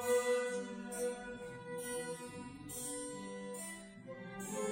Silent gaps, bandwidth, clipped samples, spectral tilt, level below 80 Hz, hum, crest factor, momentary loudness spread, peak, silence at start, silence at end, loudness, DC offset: none; 16 kHz; under 0.1%; -3.5 dB/octave; -70 dBFS; none; 18 dB; 13 LU; -24 dBFS; 0 s; 0 s; -42 LUFS; under 0.1%